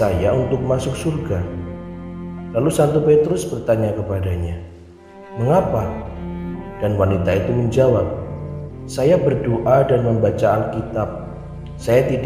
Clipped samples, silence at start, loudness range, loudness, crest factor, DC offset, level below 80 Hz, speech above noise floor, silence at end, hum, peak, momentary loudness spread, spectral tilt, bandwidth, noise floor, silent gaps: under 0.1%; 0 s; 4 LU; -19 LUFS; 16 dB; under 0.1%; -38 dBFS; 23 dB; 0 s; none; -2 dBFS; 15 LU; -7.5 dB/octave; 15.5 kHz; -41 dBFS; none